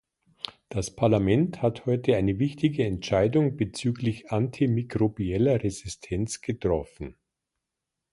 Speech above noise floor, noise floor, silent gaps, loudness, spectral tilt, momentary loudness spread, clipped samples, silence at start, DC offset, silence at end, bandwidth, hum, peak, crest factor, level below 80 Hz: 60 dB; -85 dBFS; none; -26 LUFS; -6.5 dB/octave; 11 LU; under 0.1%; 0.7 s; under 0.1%; 1 s; 11.5 kHz; none; -8 dBFS; 18 dB; -48 dBFS